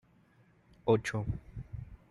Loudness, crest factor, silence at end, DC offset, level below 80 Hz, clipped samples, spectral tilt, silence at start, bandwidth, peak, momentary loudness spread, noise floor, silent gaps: -34 LUFS; 22 dB; 0.15 s; under 0.1%; -52 dBFS; under 0.1%; -6.5 dB/octave; 0.85 s; 12 kHz; -14 dBFS; 17 LU; -65 dBFS; none